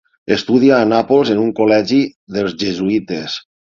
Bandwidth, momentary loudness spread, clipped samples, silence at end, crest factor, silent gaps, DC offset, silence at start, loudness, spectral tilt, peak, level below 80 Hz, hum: 7.4 kHz; 10 LU; under 0.1%; 0.25 s; 14 dB; 2.15-2.27 s; under 0.1%; 0.3 s; -15 LUFS; -6 dB/octave; 0 dBFS; -52 dBFS; none